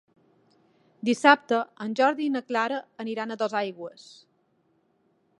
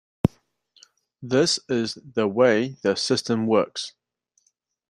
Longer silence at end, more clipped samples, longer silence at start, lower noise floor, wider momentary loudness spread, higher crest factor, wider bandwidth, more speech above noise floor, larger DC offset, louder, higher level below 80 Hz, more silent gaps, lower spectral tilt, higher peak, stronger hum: first, 1.5 s vs 1 s; neither; first, 1.05 s vs 0.25 s; about the same, -69 dBFS vs -71 dBFS; first, 15 LU vs 9 LU; about the same, 26 dB vs 22 dB; about the same, 11.5 kHz vs 12 kHz; second, 43 dB vs 48 dB; neither; about the same, -25 LUFS vs -23 LUFS; second, -82 dBFS vs -52 dBFS; neither; about the same, -4 dB/octave vs -4.5 dB/octave; about the same, -2 dBFS vs -4 dBFS; second, none vs 60 Hz at -50 dBFS